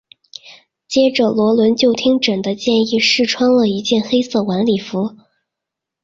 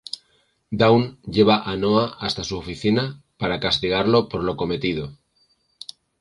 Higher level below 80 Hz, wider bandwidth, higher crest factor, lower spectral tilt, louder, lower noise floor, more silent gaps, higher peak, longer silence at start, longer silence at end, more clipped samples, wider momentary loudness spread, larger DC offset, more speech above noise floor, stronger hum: second, -56 dBFS vs -48 dBFS; second, 7.8 kHz vs 11.5 kHz; second, 14 dB vs 20 dB; second, -4.5 dB/octave vs -6 dB/octave; first, -15 LUFS vs -21 LUFS; first, -82 dBFS vs -65 dBFS; neither; about the same, -2 dBFS vs -2 dBFS; second, 0.45 s vs 0.7 s; second, 0.9 s vs 1.05 s; neither; second, 9 LU vs 18 LU; neither; first, 68 dB vs 44 dB; neither